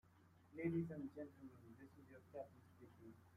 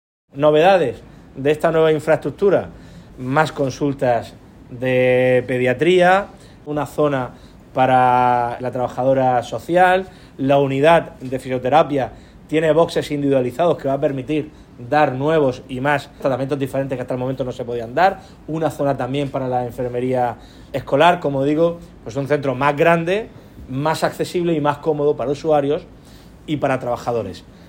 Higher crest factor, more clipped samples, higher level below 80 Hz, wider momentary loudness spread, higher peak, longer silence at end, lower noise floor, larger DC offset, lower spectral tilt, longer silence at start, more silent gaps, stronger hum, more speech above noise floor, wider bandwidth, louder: about the same, 20 dB vs 18 dB; neither; second, -84 dBFS vs -48 dBFS; first, 20 LU vs 13 LU; second, -32 dBFS vs 0 dBFS; second, 0 s vs 0.25 s; first, -71 dBFS vs -42 dBFS; neither; first, -9.5 dB/octave vs -6.5 dB/octave; second, 0.05 s vs 0.35 s; neither; neither; second, 19 dB vs 24 dB; second, 14.5 kHz vs 16.5 kHz; second, -50 LUFS vs -18 LUFS